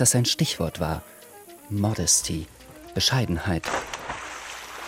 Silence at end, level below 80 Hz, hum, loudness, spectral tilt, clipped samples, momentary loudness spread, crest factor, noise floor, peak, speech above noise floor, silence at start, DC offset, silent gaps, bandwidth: 0 s; -46 dBFS; none; -25 LUFS; -3 dB/octave; under 0.1%; 24 LU; 20 dB; -46 dBFS; -6 dBFS; 22 dB; 0 s; under 0.1%; none; 16.5 kHz